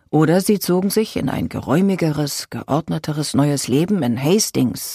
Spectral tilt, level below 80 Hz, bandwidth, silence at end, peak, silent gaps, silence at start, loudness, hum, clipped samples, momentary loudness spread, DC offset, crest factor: -5.5 dB/octave; -50 dBFS; 15.5 kHz; 0 s; -4 dBFS; none; 0.1 s; -19 LUFS; none; under 0.1%; 6 LU; under 0.1%; 14 dB